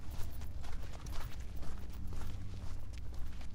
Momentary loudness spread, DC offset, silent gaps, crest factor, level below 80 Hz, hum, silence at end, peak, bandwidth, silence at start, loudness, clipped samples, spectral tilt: 2 LU; under 0.1%; none; 12 dB; -44 dBFS; none; 0 s; -24 dBFS; 16 kHz; 0 s; -47 LUFS; under 0.1%; -5.5 dB/octave